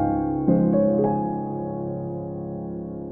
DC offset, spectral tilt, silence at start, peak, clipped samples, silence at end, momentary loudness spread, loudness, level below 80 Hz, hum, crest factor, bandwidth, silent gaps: under 0.1%; -14.5 dB/octave; 0 s; -8 dBFS; under 0.1%; 0 s; 12 LU; -24 LUFS; -46 dBFS; none; 16 dB; 2.4 kHz; none